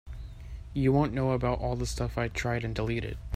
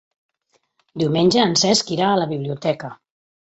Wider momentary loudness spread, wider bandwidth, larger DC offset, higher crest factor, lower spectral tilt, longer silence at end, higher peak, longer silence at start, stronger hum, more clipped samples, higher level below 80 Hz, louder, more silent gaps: first, 18 LU vs 12 LU; first, 15 kHz vs 8.4 kHz; neither; about the same, 18 dB vs 18 dB; first, -6.5 dB/octave vs -4 dB/octave; second, 0 s vs 0.45 s; second, -12 dBFS vs -4 dBFS; second, 0.05 s vs 0.95 s; neither; neither; first, -40 dBFS vs -58 dBFS; second, -30 LUFS vs -19 LUFS; neither